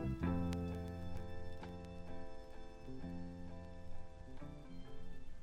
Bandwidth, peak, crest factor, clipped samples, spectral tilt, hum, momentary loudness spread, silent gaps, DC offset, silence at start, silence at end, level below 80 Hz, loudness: 9.2 kHz; -24 dBFS; 20 dB; under 0.1%; -8 dB/octave; none; 16 LU; none; under 0.1%; 0 s; 0 s; -52 dBFS; -48 LUFS